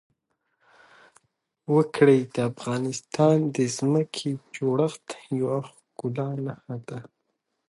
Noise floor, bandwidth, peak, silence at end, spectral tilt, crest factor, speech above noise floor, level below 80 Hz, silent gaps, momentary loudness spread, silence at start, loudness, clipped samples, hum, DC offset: -78 dBFS; 11.5 kHz; -6 dBFS; 0.65 s; -6.5 dB/octave; 20 dB; 53 dB; -70 dBFS; none; 17 LU; 1.7 s; -25 LUFS; under 0.1%; none; under 0.1%